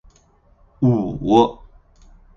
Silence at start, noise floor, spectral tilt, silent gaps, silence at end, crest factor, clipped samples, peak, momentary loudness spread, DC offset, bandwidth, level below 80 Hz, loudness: 0.8 s; -55 dBFS; -8.5 dB/octave; none; 0.85 s; 20 dB; under 0.1%; 0 dBFS; 6 LU; under 0.1%; 7.2 kHz; -44 dBFS; -18 LUFS